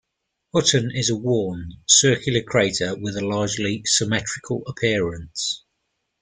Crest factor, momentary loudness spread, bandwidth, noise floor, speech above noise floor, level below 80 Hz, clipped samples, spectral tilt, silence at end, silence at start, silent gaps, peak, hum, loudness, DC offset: 20 dB; 12 LU; 10 kHz; -78 dBFS; 56 dB; -52 dBFS; under 0.1%; -3 dB/octave; 0.65 s; 0.55 s; none; -2 dBFS; none; -21 LUFS; under 0.1%